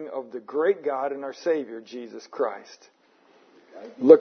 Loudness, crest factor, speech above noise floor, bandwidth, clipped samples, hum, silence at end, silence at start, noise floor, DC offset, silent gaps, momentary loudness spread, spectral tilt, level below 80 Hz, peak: -26 LUFS; 24 dB; 35 dB; 6.4 kHz; under 0.1%; none; 0 s; 0 s; -59 dBFS; under 0.1%; none; 15 LU; -6 dB/octave; -84 dBFS; 0 dBFS